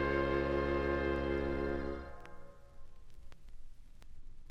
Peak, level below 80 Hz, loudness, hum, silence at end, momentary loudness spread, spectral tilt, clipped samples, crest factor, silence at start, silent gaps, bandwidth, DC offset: -22 dBFS; -46 dBFS; -35 LUFS; none; 0 s; 20 LU; -8 dB/octave; under 0.1%; 16 dB; 0 s; none; 8 kHz; under 0.1%